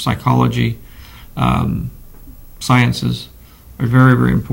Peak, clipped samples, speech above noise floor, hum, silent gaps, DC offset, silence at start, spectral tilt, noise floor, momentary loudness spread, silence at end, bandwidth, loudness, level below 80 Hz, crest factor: 0 dBFS; under 0.1%; 23 dB; none; none; under 0.1%; 0 s; -6.5 dB/octave; -37 dBFS; 18 LU; 0 s; 16.5 kHz; -15 LUFS; -34 dBFS; 16 dB